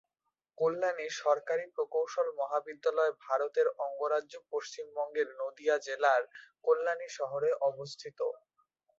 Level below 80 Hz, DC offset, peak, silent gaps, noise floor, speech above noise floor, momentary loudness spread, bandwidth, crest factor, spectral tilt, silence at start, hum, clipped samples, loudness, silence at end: -86 dBFS; under 0.1%; -14 dBFS; none; -86 dBFS; 54 dB; 9 LU; 7.8 kHz; 20 dB; -3 dB/octave; 0.6 s; none; under 0.1%; -33 LUFS; 0.65 s